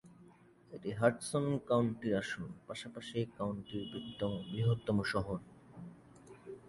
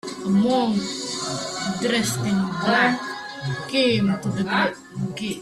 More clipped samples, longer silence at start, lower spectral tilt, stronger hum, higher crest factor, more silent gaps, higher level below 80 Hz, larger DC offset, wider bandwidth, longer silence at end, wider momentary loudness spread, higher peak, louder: neither; about the same, 0.05 s vs 0.05 s; first, -6.5 dB/octave vs -4.5 dB/octave; neither; about the same, 22 dB vs 18 dB; neither; about the same, -62 dBFS vs -58 dBFS; neither; second, 11.5 kHz vs 13.5 kHz; about the same, 0 s vs 0 s; first, 20 LU vs 10 LU; second, -14 dBFS vs -4 dBFS; second, -37 LUFS vs -23 LUFS